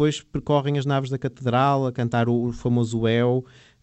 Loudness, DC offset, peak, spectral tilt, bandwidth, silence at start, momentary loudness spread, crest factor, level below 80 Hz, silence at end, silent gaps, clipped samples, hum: -23 LUFS; under 0.1%; -8 dBFS; -7 dB/octave; 8.6 kHz; 0 s; 6 LU; 14 dB; -50 dBFS; 0.4 s; none; under 0.1%; none